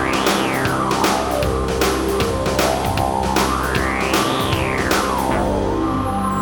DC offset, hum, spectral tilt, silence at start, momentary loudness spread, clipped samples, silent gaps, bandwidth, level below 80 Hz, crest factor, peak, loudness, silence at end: under 0.1%; none; -4.5 dB/octave; 0 s; 2 LU; under 0.1%; none; 19 kHz; -30 dBFS; 16 dB; -2 dBFS; -18 LUFS; 0 s